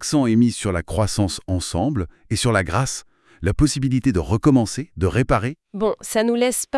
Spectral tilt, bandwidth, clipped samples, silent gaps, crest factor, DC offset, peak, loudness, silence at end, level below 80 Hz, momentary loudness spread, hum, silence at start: -5.5 dB/octave; 12 kHz; under 0.1%; none; 18 dB; under 0.1%; -2 dBFS; -21 LUFS; 0 s; -38 dBFS; 8 LU; none; 0 s